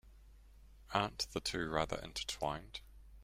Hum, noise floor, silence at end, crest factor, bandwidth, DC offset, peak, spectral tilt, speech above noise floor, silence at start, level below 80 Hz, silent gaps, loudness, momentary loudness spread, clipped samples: none; -60 dBFS; 0 s; 24 dB; 16 kHz; under 0.1%; -16 dBFS; -3.5 dB/octave; 20 dB; 0.05 s; -56 dBFS; none; -39 LUFS; 8 LU; under 0.1%